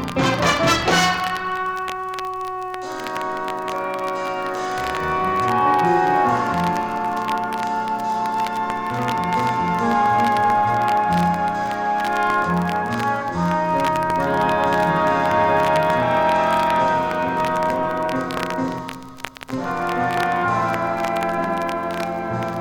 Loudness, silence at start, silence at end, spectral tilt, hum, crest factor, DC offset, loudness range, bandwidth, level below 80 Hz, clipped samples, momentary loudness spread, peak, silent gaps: -20 LUFS; 0 s; 0 s; -5 dB/octave; none; 18 dB; under 0.1%; 5 LU; 18.5 kHz; -48 dBFS; under 0.1%; 9 LU; -2 dBFS; none